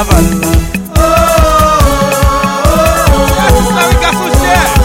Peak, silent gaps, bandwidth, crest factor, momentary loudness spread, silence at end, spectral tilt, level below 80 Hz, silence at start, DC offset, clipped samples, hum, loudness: 0 dBFS; none; 17 kHz; 8 dB; 4 LU; 0 s; -5 dB/octave; -14 dBFS; 0 s; under 0.1%; 0.4%; none; -9 LUFS